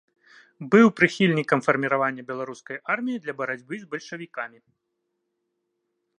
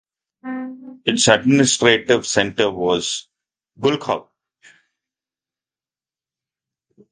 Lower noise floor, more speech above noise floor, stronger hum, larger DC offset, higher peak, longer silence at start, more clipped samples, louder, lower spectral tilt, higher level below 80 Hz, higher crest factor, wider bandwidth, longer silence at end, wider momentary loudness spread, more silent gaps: second, -78 dBFS vs under -90 dBFS; second, 55 dB vs over 73 dB; neither; neither; about the same, -2 dBFS vs 0 dBFS; first, 0.6 s vs 0.45 s; neither; second, -23 LUFS vs -18 LUFS; first, -6 dB/octave vs -3.5 dB/octave; second, -72 dBFS vs -56 dBFS; about the same, 24 dB vs 22 dB; about the same, 10 kHz vs 10 kHz; second, 1.7 s vs 2.9 s; about the same, 17 LU vs 16 LU; neither